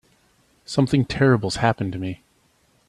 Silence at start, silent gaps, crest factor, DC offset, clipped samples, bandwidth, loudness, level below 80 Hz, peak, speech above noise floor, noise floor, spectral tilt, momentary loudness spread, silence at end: 0.7 s; none; 20 dB; under 0.1%; under 0.1%; 11.5 kHz; -22 LUFS; -48 dBFS; -2 dBFS; 42 dB; -62 dBFS; -6.5 dB/octave; 13 LU; 0.75 s